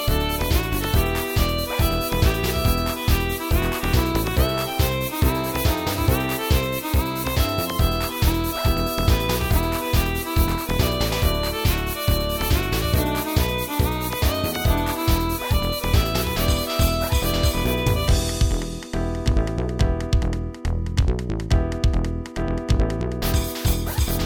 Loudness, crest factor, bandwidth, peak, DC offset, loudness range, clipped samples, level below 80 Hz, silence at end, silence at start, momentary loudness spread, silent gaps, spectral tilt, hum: -22 LUFS; 16 dB; 18 kHz; -6 dBFS; under 0.1%; 2 LU; under 0.1%; -24 dBFS; 0 s; 0 s; 3 LU; none; -5 dB/octave; none